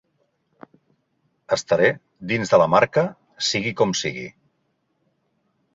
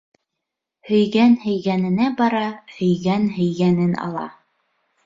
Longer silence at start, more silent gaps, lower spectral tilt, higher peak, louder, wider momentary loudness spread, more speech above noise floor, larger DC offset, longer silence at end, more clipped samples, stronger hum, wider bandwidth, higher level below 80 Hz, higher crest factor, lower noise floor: first, 1.5 s vs 0.85 s; neither; second, -4 dB/octave vs -8 dB/octave; about the same, -2 dBFS vs -4 dBFS; about the same, -21 LUFS vs -19 LUFS; about the same, 12 LU vs 11 LU; second, 51 dB vs 63 dB; neither; first, 1.45 s vs 0.75 s; neither; neither; about the same, 8 kHz vs 7.6 kHz; about the same, -60 dBFS vs -60 dBFS; first, 22 dB vs 16 dB; second, -71 dBFS vs -82 dBFS